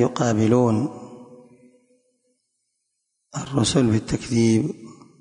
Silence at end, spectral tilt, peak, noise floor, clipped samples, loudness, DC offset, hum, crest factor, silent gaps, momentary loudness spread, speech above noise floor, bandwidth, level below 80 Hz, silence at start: 0.3 s; -6 dB/octave; -6 dBFS; -76 dBFS; under 0.1%; -21 LUFS; under 0.1%; none; 18 dB; none; 18 LU; 56 dB; 11 kHz; -50 dBFS; 0 s